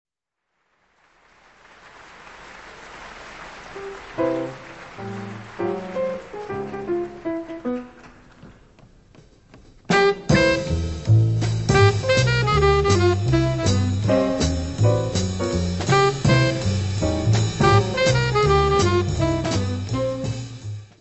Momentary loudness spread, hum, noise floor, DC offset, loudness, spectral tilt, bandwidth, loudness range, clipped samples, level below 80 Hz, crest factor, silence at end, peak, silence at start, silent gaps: 19 LU; none; -80 dBFS; 0.1%; -21 LUFS; -5.5 dB/octave; 8.4 kHz; 13 LU; under 0.1%; -36 dBFS; 18 dB; 0.15 s; -2 dBFS; 2 s; none